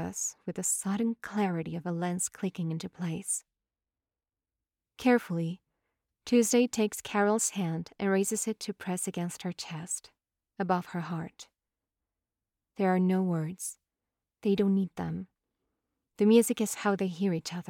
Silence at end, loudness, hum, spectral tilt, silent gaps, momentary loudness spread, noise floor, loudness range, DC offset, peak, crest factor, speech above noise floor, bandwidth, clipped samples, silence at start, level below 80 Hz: 0.1 s; -30 LUFS; none; -5 dB/octave; none; 11 LU; under -90 dBFS; 7 LU; under 0.1%; -10 dBFS; 20 dB; over 60 dB; 17.5 kHz; under 0.1%; 0 s; -72 dBFS